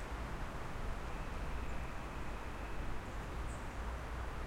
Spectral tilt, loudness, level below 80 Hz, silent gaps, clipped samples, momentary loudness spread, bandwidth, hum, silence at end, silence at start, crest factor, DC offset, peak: -5.5 dB/octave; -45 LUFS; -44 dBFS; none; under 0.1%; 1 LU; 16 kHz; none; 0 s; 0 s; 12 dB; under 0.1%; -30 dBFS